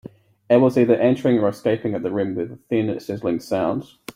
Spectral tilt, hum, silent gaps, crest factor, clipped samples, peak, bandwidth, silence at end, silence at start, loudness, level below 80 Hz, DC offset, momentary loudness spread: -7.5 dB/octave; none; none; 18 dB; under 0.1%; -2 dBFS; 15.5 kHz; 0.05 s; 0.05 s; -21 LUFS; -60 dBFS; under 0.1%; 9 LU